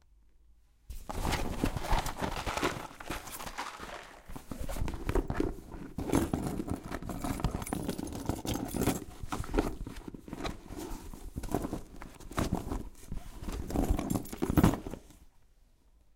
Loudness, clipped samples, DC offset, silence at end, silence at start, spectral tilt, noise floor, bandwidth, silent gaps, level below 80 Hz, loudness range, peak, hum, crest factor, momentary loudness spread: -36 LUFS; under 0.1%; under 0.1%; 0.85 s; 0.9 s; -5.5 dB/octave; -63 dBFS; 17 kHz; none; -40 dBFS; 5 LU; -12 dBFS; none; 22 dB; 14 LU